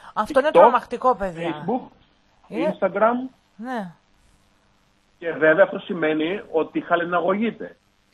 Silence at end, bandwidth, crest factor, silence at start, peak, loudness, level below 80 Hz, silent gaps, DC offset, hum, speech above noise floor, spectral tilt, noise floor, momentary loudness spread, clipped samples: 0.45 s; 12 kHz; 22 dB; 0.05 s; -2 dBFS; -21 LUFS; -56 dBFS; none; under 0.1%; none; 40 dB; -6.5 dB/octave; -61 dBFS; 16 LU; under 0.1%